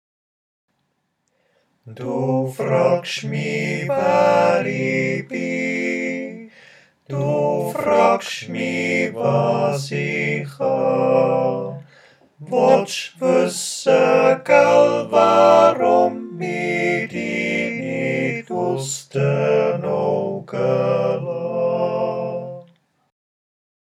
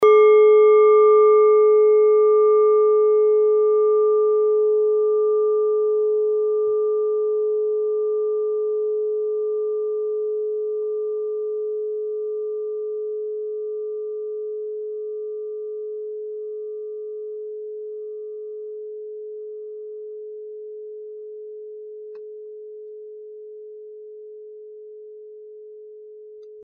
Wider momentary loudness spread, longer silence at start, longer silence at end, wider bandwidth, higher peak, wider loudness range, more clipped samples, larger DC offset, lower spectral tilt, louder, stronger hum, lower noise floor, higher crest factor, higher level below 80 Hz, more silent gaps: second, 11 LU vs 25 LU; first, 1.85 s vs 0 s; first, 1.2 s vs 0 s; first, 14.5 kHz vs 3.5 kHz; first, 0 dBFS vs -6 dBFS; second, 8 LU vs 22 LU; neither; neither; first, -5.5 dB/octave vs 3.5 dB/octave; about the same, -19 LUFS vs -19 LUFS; neither; first, -71 dBFS vs -41 dBFS; about the same, 20 dB vs 16 dB; about the same, -76 dBFS vs -78 dBFS; neither